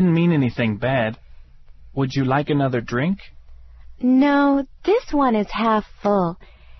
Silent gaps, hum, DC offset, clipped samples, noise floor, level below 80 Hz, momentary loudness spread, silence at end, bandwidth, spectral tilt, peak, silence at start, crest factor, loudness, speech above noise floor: none; none; under 0.1%; under 0.1%; -43 dBFS; -44 dBFS; 9 LU; 0.05 s; 6.2 kHz; -8 dB/octave; -6 dBFS; 0 s; 14 dB; -20 LUFS; 24 dB